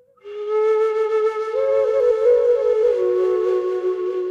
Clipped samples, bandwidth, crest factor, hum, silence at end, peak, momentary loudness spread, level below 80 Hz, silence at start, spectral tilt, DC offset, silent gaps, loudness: under 0.1%; 7.4 kHz; 12 dB; none; 0 s; -8 dBFS; 7 LU; -62 dBFS; 0.25 s; -5.5 dB/octave; under 0.1%; none; -19 LUFS